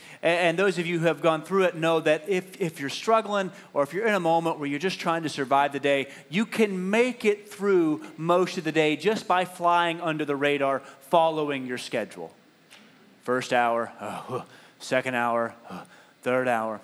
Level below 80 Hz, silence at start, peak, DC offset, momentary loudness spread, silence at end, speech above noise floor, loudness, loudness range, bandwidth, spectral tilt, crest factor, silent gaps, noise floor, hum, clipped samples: -86 dBFS; 0 s; -6 dBFS; under 0.1%; 10 LU; 0 s; 29 dB; -25 LUFS; 4 LU; 14 kHz; -5 dB/octave; 20 dB; none; -54 dBFS; none; under 0.1%